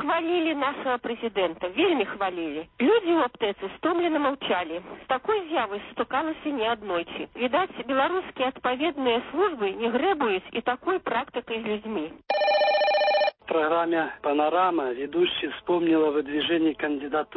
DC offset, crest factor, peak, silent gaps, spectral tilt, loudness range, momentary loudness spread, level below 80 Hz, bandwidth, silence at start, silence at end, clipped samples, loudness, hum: under 0.1%; 14 dB; -10 dBFS; none; -8.5 dB/octave; 4 LU; 8 LU; -62 dBFS; 5.8 kHz; 0 s; 0 s; under 0.1%; -26 LUFS; none